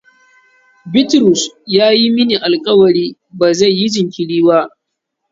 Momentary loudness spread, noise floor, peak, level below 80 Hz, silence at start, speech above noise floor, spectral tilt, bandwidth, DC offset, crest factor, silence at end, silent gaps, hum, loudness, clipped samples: 7 LU; -74 dBFS; 0 dBFS; -58 dBFS; 0.85 s; 63 dB; -4.5 dB/octave; 7.8 kHz; under 0.1%; 14 dB; 0.65 s; none; none; -12 LUFS; under 0.1%